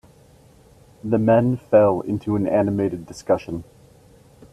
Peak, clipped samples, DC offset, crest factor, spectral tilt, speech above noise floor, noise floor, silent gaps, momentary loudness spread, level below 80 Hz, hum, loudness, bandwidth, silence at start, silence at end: -4 dBFS; under 0.1%; under 0.1%; 18 dB; -8.5 dB/octave; 31 dB; -51 dBFS; none; 16 LU; -54 dBFS; none; -20 LUFS; 12.5 kHz; 1.05 s; 0.9 s